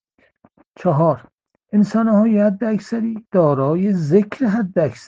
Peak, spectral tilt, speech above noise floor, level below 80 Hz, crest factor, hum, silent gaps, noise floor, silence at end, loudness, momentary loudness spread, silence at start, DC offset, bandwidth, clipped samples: -2 dBFS; -9 dB/octave; 40 dB; -60 dBFS; 16 dB; none; 1.33-1.38 s; -56 dBFS; 0.1 s; -18 LUFS; 7 LU; 0.8 s; under 0.1%; 7.6 kHz; under 0.1%